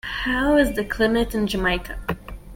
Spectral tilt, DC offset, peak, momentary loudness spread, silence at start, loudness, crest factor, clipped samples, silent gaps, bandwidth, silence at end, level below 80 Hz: -5 dB/octave; under 0.1%; -6 dBFS; 12 LU; 0.05 s; -22 LUFS; 18 dB; under 0.1%; none; 17 kHz; 0 s; -34 dBFS